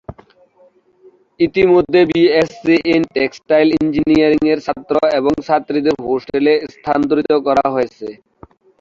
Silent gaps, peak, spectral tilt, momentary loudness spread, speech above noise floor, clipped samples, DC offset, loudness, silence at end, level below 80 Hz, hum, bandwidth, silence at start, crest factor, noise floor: none; -2 dBFS; -6.5 dB/octave; 7 LU; 37 dB; under 0.1%; under 0.1%; -15 LUFS; 0.65 s; -48 dBFS; none; 7.4 kHz; 0.1 s; 14 dB; -52 dBFS